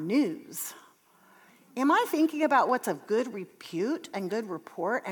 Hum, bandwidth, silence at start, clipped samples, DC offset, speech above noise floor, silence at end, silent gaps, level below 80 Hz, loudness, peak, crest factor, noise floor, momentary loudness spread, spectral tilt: none; over 20 kHz; 0 s; under 0.1%; under 0.1%; 32 dB; 0 s; none; under -90 dBFS; -29 LUFS; -12 dBFS; 18 dB; -60 dBFS; 14 LU; -4.5 dB/octave